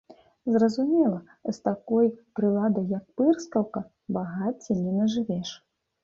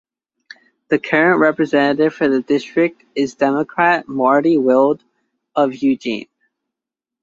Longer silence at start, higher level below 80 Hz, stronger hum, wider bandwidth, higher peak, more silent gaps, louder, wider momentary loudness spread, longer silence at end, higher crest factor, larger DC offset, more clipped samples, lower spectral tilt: second, 0.45 s vs 0.9 s; about the same, -66 dBFS vs -62 dBFS; neither; about the same, 7.6 kHz vs 7.6 kHz; second, -10 dBFS vs 0 dBFS; neither; second, -26 LUFS vs -16 LUFS; about the same, 10 LU vs 9 LU; second, 0.5 s vs 1 s; about the same, 16 dB vs 16 dB; neither; neither; about the same, -7.5 dB/octave vs -6.5 dB/octave